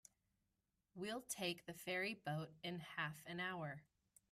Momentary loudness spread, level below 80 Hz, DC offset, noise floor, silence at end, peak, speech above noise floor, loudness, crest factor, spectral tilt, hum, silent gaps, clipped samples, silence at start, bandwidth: 8 LU; -82 dBFS; under 0.1%; -88 dBFS; 0.5 s; -32 dBFS; 41 dB; -47 LUFS; 18 dB; -4 dB/octave; none; none; under 0.1%; 0.95 s; 15.5 kHz